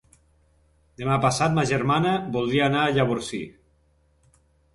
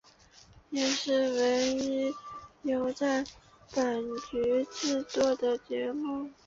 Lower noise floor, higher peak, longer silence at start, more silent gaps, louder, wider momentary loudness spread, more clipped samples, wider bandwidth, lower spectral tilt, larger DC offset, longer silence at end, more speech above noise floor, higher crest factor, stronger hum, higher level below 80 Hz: first, -63 dBFS vs -58 dBFS; first, -8 dBFS vs -12 dBFS; first, 1 s vs 0.55 s; neither; first, -23 LUFS vs -30 LUFS; about the same, 11 LU vs 9 LU; neither; first, 11.5 kHz vs 7.8 kHz; first, -5.5 dB/octave vs -3 dB/octave; neither; first, 1.25 s vs 0.15 s; first, 41 dB vs 28 dB; about the same, 18 dB vs 20 dB; neither; first, -52 dBFS vs -64 dBFS